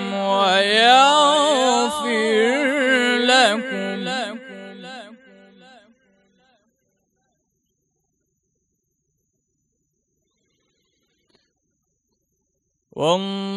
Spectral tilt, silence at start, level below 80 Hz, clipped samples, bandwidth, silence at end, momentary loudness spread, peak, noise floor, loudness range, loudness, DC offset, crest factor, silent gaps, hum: -2.5 dB/octave; 0 s; -72 dBFS; under 0.1%; 12 kHz; 0 s; 24 LU; -2 dBFS; -74 dBFS; 17 LU; -17 LUFS; under 0.1%; 20 dB; none; none